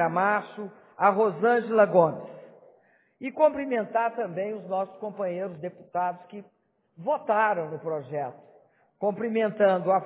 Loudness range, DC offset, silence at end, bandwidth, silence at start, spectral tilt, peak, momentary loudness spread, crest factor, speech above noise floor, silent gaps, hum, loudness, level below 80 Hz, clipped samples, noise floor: 6 LU; under 0.1%; 0 s; 4 kHz; 0 s; -10 dB/octave; -6 dBFS; 17 LU; 20 dB; 36 dB; none; none; -26 LUFS; -76 dBFS; under 0.1%; -62 dBFS